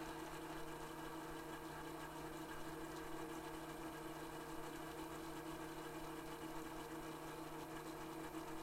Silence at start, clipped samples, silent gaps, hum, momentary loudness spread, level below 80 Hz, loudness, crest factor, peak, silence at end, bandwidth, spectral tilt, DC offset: 0 s; under 0.1%; none; none; 1 LU; -64 dBFS; -50 LUFS; 14 dB; -36 dBFS; 0 s; 16 kHz; -4.5 dB/octave; under 0.1%